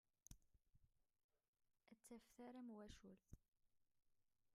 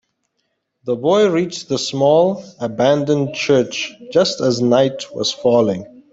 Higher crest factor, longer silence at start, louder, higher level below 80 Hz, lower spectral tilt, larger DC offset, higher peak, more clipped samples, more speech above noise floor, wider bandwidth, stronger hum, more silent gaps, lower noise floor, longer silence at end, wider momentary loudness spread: first, 26 dB vs 16 dB; second, 0.3 s vs 0.85 s; second, -62 LUFS vs -17 LUFS; second, -78 dBFS vs -60 dBFS; about the same, -5 dB/octave vs -5 dB/octave; neither; second, -42 dBFS vs -2 dBFS; neither; second, 22 dB vs 55 dB; first, 13.5 kHz vs 8 kHz; neither; first, 1.24-1.29 s, 1.48-1.53 s vs none; first, -84 dBFS vs -71 dBFS; second, 0 s vs 0.25 s; second, 7 LU vs 10 LU